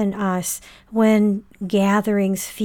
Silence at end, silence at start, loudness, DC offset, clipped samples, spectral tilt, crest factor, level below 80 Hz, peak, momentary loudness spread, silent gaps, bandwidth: 0 s; 0 s; -20 LUFS; under 0.1%; under 0.1%; -5.5 dB/octave; 14 dB; -56 dBFS; -6 dBFS; 11 LU; none; 18.5 kHz